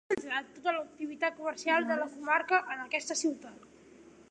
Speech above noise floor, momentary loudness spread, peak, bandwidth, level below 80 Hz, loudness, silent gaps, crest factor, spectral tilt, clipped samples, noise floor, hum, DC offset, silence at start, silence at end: 24 dB; 8 LU; -12 dBFS; 11 kHz; -76 dBFS; -32 LUFS; none; 20 dB; -2 dB/octave; under 0.1%; -56 dBFS; none; under 0.1%; 0.1 s; 0.3 s